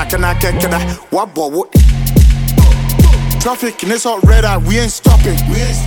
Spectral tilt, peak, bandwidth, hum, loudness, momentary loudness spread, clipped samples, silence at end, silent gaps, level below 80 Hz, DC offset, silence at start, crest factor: -5.5 dB/octave; 0 dBFS; 19.5 kHz; none; -12 LUFS; 7 LU; under 0.1%; 0 s; none; -12 dBFS; under 0.1%; 0 s; 10 dB